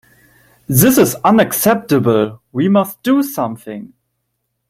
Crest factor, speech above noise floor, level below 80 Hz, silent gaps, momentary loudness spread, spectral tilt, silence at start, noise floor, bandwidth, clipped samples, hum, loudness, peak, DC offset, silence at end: 16 dB; 57 dB; -50 dBFS; none; 12 LU; -5.5 dB/octave; 0.7 s; -71 dBFS; 16.5 kHz; under 0.1%; none; -14 LUFS; 0 dBFS; under 0.1%; 0.85 s